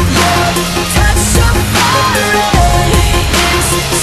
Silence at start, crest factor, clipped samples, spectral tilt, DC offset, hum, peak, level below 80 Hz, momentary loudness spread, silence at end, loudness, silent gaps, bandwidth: 0 s; 10 dB; under 0.1%; -3.5 dB/octave; under 0.1%; none; 0 dBFS; -16 dBFS; 2 LU; 0 s; -10 LUFS; none; 13 kHz